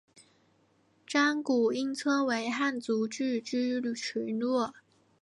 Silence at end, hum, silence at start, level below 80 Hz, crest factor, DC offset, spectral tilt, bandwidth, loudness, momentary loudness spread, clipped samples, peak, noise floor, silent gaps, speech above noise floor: 0.5 s; none; 0.15 s; -82 dBFS; 16 dB; under 0.1%; -3.5 dB/octave; 11.5 kHz; -30 LUFS; 6 LU; under 0.1%; -16 dBFS; -68 dBFS; none; 38 dB